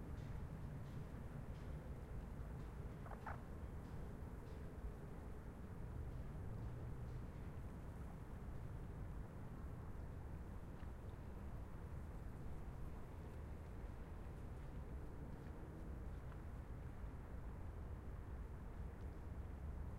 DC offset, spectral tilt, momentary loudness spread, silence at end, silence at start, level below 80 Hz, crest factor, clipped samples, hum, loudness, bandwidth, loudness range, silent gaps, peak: under 0.1%; -8 dB/octave; 3 LU; 0 s; 0 s; -54 dBFS; 12 dB; under 0.1%; none; -53 LUFS; 16 kHz; 1 LU; none; -38 dBFS